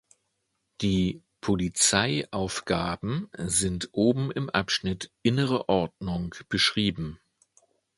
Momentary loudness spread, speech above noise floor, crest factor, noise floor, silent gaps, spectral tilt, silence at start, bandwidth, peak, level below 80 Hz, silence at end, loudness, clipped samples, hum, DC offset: 10 LU; 51 dB; 24 dB; -77 dBFS; none; -4 dB/octave; 0.8 s; 11.5 kHz; -4 dBFS; -50 dBFS; 0.85 s; -27 LUFS; under 0.1%; none; under 0.1%